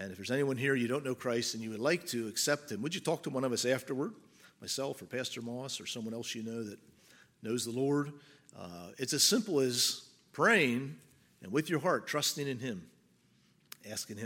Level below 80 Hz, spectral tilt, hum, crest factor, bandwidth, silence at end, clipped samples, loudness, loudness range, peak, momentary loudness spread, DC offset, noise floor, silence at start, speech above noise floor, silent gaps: -80 dBFS; -3.5 dB/octave; none; 22 dB; 17 kHz; 0 s; under 0.1%; -33 LUFS; 8 LU; -14 dBFS; 19 LU; under 0.1%; -68 dBFS; 0 s; 34 dB; none